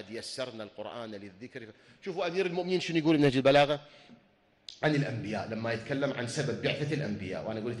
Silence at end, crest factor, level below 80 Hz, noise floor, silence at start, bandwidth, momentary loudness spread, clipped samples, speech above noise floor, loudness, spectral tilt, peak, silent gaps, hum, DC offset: 0 s; 18 dB; -66 dBFS; -53 dBFS; 0 s; 12 kHz; 20 LU; under 0.1%; 22 dB; -30 LUFS; -6 dB/octave; -12 dBFS; none; none; under 0.1%